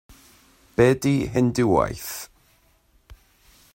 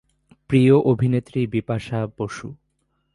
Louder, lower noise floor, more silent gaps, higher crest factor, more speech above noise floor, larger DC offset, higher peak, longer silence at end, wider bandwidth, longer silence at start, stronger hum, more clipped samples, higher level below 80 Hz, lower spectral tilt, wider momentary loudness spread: about the same, -22 LUFS vs -21 LUFS; second, -61 dBFS vs -70 dBFS; neither; about the same, 20 dB vs 18 dB; second, 40 dB vs 51 dB; neither; about the same, -4 dBFS vs -4 dBFS; about the same, 0.6 s vs 0.6 s; first, 16.5 kHz vs 11 kHz; first, 0.8 s vs 0.5 s; neither; neither; about the same, -48 dBFS vs -52 dBFS; second, -6.5 dB/octave vs -8.5 dB/octave; about the same, 15 LU vs 15 LU